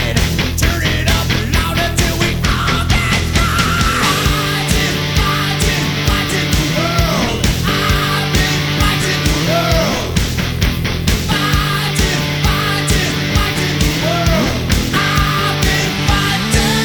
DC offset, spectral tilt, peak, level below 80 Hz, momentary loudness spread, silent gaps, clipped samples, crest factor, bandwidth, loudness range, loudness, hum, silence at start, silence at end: under 0.1%; -4 dB/octave; 0 dBFS; -22 dBFS; 2 LU; none; under 0.1%; 14 dB; over 20 kHz; 1 LU; -14 LUFS; none; 0 s; 0 s